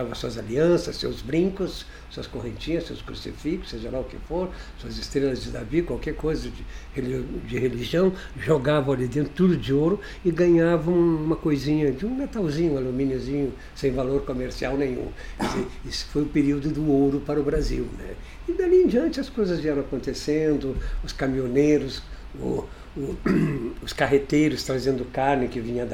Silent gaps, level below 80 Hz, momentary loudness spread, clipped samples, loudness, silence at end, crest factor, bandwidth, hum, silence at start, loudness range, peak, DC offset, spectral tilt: none; -38 dBFS; 13 LU; under 0.1%; -25 LUFS; 0 s; 18 dB; 15.5 kHz; none; 0 s; 7 LU; -8 dBFS; under 0.1%; -6.5 dB/octave